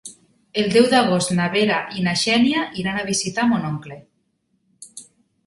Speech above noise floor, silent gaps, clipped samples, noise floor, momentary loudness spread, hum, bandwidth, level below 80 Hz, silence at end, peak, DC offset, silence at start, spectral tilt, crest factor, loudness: 49 dB; none; under 0.1%; -68 dBFS; 23 LU; none; 11.5 kHz; -58 dBFS; 0.45 s; -2 dBFS; under 0.1%; 0.05 s; -4 dB/octave; 20 dB; -19 LUFS